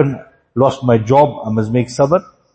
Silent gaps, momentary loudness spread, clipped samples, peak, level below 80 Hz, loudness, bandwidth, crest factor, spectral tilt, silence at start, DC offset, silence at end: none; 7 LU; under 0.1%; 0 dBFS; -48 dBFS; -15 LUFS; 8.8 kHz; 14 dB; -7.5 dB/octave; 0 s; under 0.1%; 0.35 s